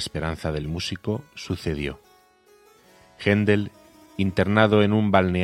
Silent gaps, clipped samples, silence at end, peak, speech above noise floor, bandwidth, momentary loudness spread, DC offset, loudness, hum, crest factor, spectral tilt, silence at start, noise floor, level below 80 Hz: none; under 0.1%; 0 s; 0 dBFS; 34 dB; 13 kHz; 14 LU; under 0.1%; -23 LUFS; none; 24 dB; -6.5 dB/octave; 0 s; -56 dBFS; -48 dBFS